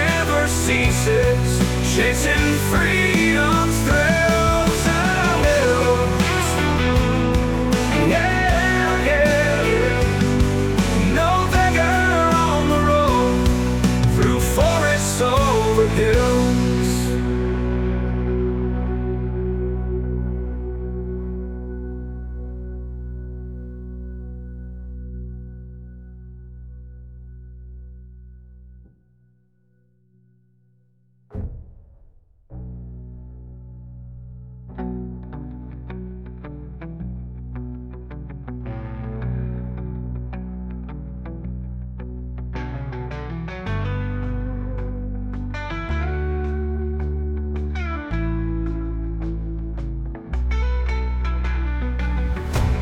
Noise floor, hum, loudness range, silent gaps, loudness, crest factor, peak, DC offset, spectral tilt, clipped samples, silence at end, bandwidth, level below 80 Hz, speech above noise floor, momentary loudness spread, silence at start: -61 dBFS; none; 19 LU; none; -20 LUFS; 16 dB; -4 dBFS; under 0.1%; -5.5 dB/octave; under 0.1%; 0 s; 18 kHz; -28 dBFS; 44 dB; 20 LU; 0 s